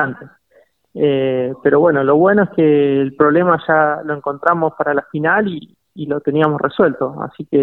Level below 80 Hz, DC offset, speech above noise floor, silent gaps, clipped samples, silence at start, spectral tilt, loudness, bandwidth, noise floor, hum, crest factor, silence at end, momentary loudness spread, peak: -58 dBFS; under 0.1%; 39 dB; none; under 0.1%; 0 s; -10 dB/octave; -15 LUFS; 4.2 kHz; -54 dBFS; none; 16 dB; 0 s; 10 LU; 0 dBFS